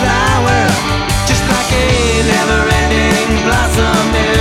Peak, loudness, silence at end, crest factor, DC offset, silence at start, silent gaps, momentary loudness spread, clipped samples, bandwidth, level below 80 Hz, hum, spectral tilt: 0 dBFS; -12 LUFS; 0 s; 10 dB; under 0.1%; 0 s; none; 2 LU; under 0.1%; 16.5 kHz; -20 dBFS; none; -4.5 dB/octave